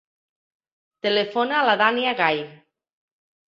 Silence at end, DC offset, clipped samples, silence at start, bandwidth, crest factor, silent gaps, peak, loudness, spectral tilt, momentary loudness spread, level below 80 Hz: 0.95 s; under 0.1%; under 0.1%; 1.05 s; 7.6 kHz; 20 dB; none; -4 dBFS; -21 LUFS; -5.5 dB/octave; 10 LU; -74 dBFS